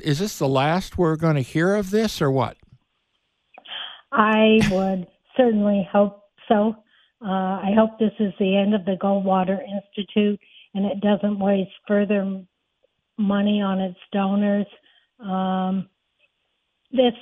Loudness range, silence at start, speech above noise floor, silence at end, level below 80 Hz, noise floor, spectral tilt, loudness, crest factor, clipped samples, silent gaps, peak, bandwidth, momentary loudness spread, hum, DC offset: 4 LU; 0.05 s; 53 dB; 0 s; -52 dBFS; -73 dBFS; -6.5 dB/octave; -22 LUFS; 20 dB; under 0.1%; none; -2 dBFS; 13.5 kHz; 11 LU; none; under 0.1%